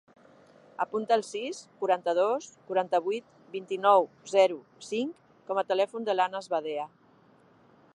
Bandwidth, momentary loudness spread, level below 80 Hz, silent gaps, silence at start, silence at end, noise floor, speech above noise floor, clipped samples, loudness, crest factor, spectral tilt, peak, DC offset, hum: 11 kHz; 12 LU; -84 dBFS; none; 0.8 s; 1.1 s; -60 dBFS; 32 dB; under 0.1%; -29 LUFS; 22 dB; -4 dB/octave; -8 dBFS; under 0.1%; none